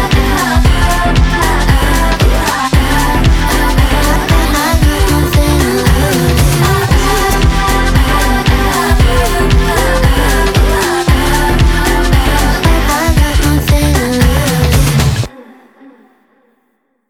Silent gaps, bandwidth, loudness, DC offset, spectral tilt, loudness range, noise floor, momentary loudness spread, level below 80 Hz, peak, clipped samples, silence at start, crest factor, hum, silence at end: none; 17.5 kHz; -11 LUFS; under 0.1%; -5 dB/octave; 1 LU; -60 dBFS; 1 LU; -14 dBFS; 0 dBFS; under 0.1%; 0 s; 10 dB; none; 1.65 s